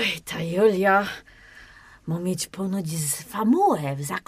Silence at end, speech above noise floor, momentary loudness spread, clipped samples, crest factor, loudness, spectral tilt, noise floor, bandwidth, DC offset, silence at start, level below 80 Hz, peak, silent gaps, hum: 0.05 s; 25 dB; 11 LU; under 0.1%; 16 dB; -24 LUFS; -4.5 dB/octave; -49 dBFS; 15.5 kHz; under 0.1%; 0 s; -58 dBFS; -8 dBFS; none; none